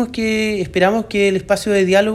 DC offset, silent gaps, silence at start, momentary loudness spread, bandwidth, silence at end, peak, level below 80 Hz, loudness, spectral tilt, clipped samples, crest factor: under 0.1%; none; 0 s; 4 LU; 13.5 kHz; 0 s; -2 dBFS; -44 dBFS; -16 LUFS; -5 dB/octave; under 0.1%; 14 dB